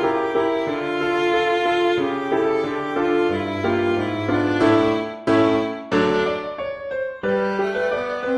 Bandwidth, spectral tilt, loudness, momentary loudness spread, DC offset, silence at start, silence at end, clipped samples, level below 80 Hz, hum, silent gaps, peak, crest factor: 10 kHz; -6.5 dB/octave; -21 LUFS; 6 LU; under 0.1%; 0 s; 0 s; under 0.1%; -52 dBFS; none; none; -6 dBFS; 16 dB